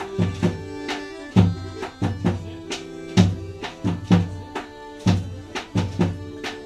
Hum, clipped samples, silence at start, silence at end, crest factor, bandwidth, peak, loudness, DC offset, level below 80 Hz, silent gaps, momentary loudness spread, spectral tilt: none; under 0.1%; 0 s; 0 s; 22 dB; 10.5 kHz; -2 dBFS; -24 LUFS; under 0.1%; -44 dBFS; none; 13 LU; -6.5 dB/octave